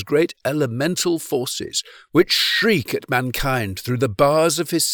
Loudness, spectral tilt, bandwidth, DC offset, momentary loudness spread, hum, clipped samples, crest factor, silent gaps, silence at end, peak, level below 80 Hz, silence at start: -20 LUFS; -4 dB/octave; over 20 kHz; under 0.1%; 8 LU; none; under 0.1%; 16 dB; none; 0 s; -4 dBFS; -44 dBFS; 0 s